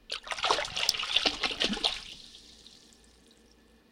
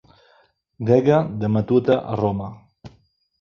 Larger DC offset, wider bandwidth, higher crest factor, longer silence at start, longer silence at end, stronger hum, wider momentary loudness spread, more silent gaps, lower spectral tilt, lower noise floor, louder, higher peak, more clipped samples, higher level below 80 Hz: neither; first, 16.5 kHz vs 6.8 kHz; first, 28 dB vs 20 dB; second, 0.1 s vs 0.8 s; first, 1.15 s vs 0.5 s; neither; first, 20 LU vs 13 LU; neither; second, -1 dB/octave vs -9 dB/octave; about the same, -61 dBFS vs -59 dBFS; second, -28 LUFS vs -20 LUFS; second, -6 dBFS vs -2 dBFS; neither; about the same, -56 dBFS vs -52 dBFS